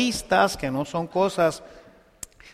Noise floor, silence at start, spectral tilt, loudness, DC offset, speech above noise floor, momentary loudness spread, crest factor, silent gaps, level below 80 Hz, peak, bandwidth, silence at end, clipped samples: -45 dBFS; 0 s; -4.5 dB/octave; -23 LUFS; under 0.1%; 21 dB; 20 LU; 18 dB; none; -50 dBFS; -6 dBFS; 15.5 kHz; 0.05 s; under 0.1%